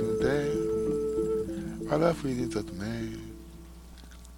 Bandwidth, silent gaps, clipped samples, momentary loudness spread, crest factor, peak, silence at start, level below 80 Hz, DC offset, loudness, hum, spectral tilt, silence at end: 17 kHz; none; under 0.1%; 22 LU; 20 dB; -10 dBFS; 0 s; -48 dBFS; under 0.1%; -30 LUFS; none; -6.5 dB/octave; 0 s